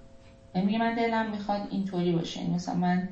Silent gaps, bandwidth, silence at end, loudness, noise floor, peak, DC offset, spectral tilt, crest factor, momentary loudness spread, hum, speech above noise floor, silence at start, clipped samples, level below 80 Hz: none; 7.8 kHz; 0 s; -29 LUFS; -51 dBFS; -16 dBFS; under 0.1%; -7 dB/octave; 14 dB; 5 LU; none; 23 dB; 0 s; under 0.1%; -56 dBFS